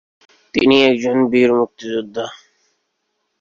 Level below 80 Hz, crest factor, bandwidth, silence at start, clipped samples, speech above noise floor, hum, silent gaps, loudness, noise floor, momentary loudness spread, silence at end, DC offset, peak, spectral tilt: -56 dBFS; 16 dB; 7.6 kHz; 0.55 s; under 0.1%; 56 dB; none; none; -16 LUFS; -71 dBFS; 15 LU; 1.05 s; under 0.1%; -2 dBFS; -5 dB/octave